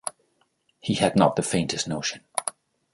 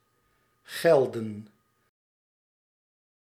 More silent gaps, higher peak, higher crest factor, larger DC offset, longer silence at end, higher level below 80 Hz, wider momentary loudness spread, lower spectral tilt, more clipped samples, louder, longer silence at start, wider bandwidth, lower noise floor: neither; first, -4 dBFS vs -8 dBFS; about the same, 22 dB vs 22 dB; neither; second, 0.45 s vs 1.8 s; first, -58 dBFS vs -80 dBFS; second, 14 LU vs 18 LU; about the same, -4.5 dB/octave vs -5.5 dB/octave; neither; about the same, -25 LUFS vs -25 LUFS; second, 0.05 s vs 0.7 s; second, 12 kHz vs 16 kHz; about the same, -69 dBFS vs -70 dBFS